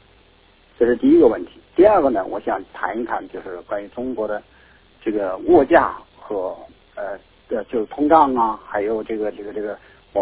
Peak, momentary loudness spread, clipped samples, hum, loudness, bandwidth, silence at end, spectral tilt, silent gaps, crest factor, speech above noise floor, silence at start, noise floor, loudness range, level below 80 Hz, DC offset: 0 dBFS; 17 LU; under 0.1%; none; -19 LUFS; 4 kHz; 0 s; -10 dB/octave; none; 20 dB; 34 dB; 0.8 s; -53 dBFS; 4 LU; -50 dBFS; under 0.1%